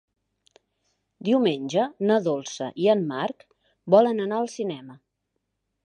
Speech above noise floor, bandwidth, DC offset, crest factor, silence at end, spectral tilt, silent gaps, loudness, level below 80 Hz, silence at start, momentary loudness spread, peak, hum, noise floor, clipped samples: 56 dB; 9.8 kHz; under 0.1%; 22 dB; 0.9 s; -6 dB/octave; none; -24 LUFS; -76 dBFS; 1.2 s; 13 LU; -4 dBFS; none; -79 dBFS; under 0.1%